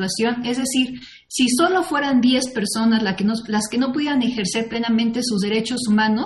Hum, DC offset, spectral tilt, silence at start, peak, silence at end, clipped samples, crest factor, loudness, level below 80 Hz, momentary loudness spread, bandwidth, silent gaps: none; under 0.1%; -4 dB/octave; 0 s; -4 dBFS; 0 s; under 0.1%; 16 dB; -20 LUFS; -56 dBFS; 5 LU; 12 kHz; none